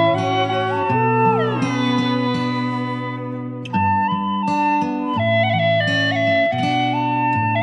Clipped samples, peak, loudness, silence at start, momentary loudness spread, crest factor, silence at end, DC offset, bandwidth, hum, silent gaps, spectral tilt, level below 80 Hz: under 0.1%; -4 dBFS; -19 LUFS; 0 s; 7 LU; 14 dB; 0 s; under 0.1%; 10 kHz; none; none; -6.5 dB/octave; -62 dBFS